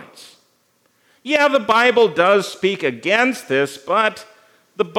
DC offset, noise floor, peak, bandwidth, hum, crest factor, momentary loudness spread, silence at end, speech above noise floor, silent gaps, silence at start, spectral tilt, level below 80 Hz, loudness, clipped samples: under 0.1%; -62 dBFS; 0 dBFS; 16.5 kHz; none; 18 dB; 7 LU; 0 s; 45 dB; none; 0 s; -4 dB/octave; -78 dBFS; -17 LUFS; under 0.1%